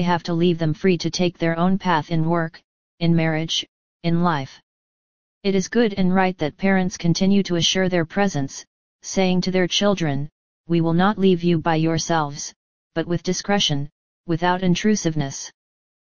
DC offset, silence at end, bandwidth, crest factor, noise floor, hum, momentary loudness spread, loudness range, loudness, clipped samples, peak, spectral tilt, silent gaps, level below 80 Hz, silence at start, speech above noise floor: 2%; 0.5 s; 7.2 kHz; 18 dB; under -90 dBFS; none; 10 LU; 3 LU; -21 LUFS; under 0.1%; -2 dBFS; -5 dB/octave; 2.64-2.98 s, 3.68-4.00 s, 4.63-5.41 s, 8.67-8.99 s, 10.32-10.64 s, 12.56-12.90 s, 13.92-14.24 s; -48 dBFS; 0 s; over 70 dB